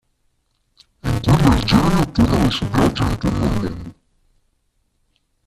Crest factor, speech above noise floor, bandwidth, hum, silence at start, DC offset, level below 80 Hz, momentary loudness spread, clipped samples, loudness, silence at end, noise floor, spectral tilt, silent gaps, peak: 18 dB; 48 dB; 14.5 kHz; none; 1.05 s; under 0.1%; -30 dBFS; 13 LU; under 0.1%; -18 LUFS; 1.55 s; -66 dBFS; -6.5 dB/octave; none; 0 dBFS